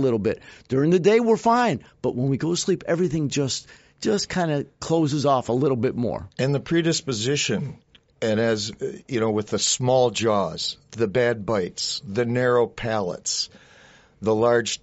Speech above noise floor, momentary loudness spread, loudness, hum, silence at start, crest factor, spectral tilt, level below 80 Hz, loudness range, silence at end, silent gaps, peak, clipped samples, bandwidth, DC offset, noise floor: 29 dB; 9 LU; -23 LUFS; none; 0 s; 16 dB; -4.5 dB/octave; -56 dBFS; 3 LU; 0.05 s; none; -6 dBFS; under 0.1%; 8 kHz; under 0.1%; -52 dBFS